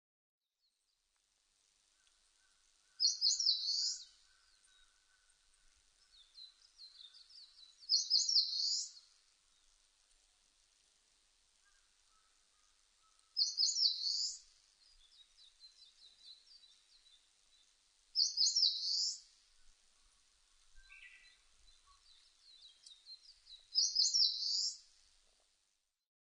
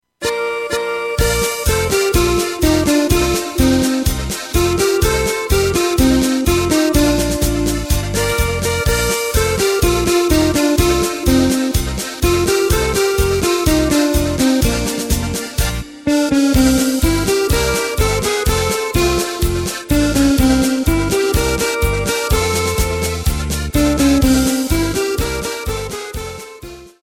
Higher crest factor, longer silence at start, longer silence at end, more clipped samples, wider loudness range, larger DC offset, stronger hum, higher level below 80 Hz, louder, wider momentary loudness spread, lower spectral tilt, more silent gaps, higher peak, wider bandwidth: first, 22 dB vs 14 dB; first, 3 s vs 0.2 s; first, 1.5 s vs 0.15 s; neither; first, 8 LU vs 1 LU; neither; neither; second, -82 dBFS vs -24 dBFS; second, -33 LUFS vs -16 LUFS; first, 26 LU vs 6 LU; second, 6 dB/octave vs -4.5 dB/octave; neither; second, -20 dBFS vs 0 dBFS; second, 10 kHz vs 17 kHz